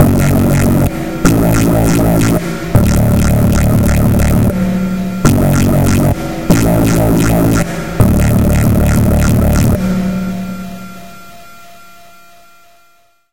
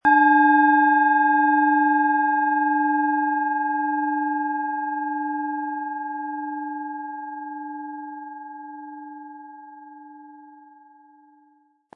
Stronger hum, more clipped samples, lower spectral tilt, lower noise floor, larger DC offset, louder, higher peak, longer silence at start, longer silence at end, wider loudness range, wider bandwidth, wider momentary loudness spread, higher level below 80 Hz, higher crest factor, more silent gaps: neither; first, 0.2% vs under 0.1%; about the same, -6.5 dB/octave vs -6 dB/octave; second, -52 dBFS vs -61 dBFS; first, 2% vs under 0.1%; first, -12 LUFS vs -21 LUFS; first, 0 dBFS vs -6 dBFS; about the same, 0 s vs 0.05 s; second, 0 s vs 1.45 s; second, 6 LU vs 22 LU; first, 17.5 kHz vs 3.8 kHz; second, 7 LU vs 22 LU; first, -20 dBFS vs -74 dBFS; about the same, 12 dB vs 16 dB; neither